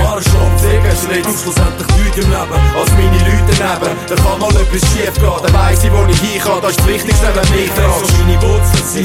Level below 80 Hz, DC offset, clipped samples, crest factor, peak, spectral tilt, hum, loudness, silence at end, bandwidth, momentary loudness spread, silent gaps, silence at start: -14 dBFS; under 0.1%; under 0.1%; 10 dB; 0 dBFS; -5 dB/octave; none; -12 LUFS; 0 s; 16.5 kHz; 3 LU; none; 0 s